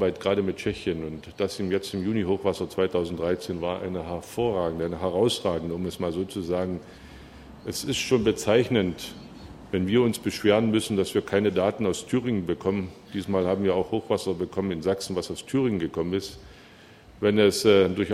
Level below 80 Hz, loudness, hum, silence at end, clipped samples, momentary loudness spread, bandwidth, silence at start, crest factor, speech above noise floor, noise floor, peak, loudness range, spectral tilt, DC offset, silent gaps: -52 dBFS; -26 LUFS; none; 0 s; under 0.1%; 12 LU; 15.5 kHz; 0 s; 18 dB; 25 dB; -50 dBFS; -6 dBFS; 4 LU; -5.5 dB/octave; under 0.1%; none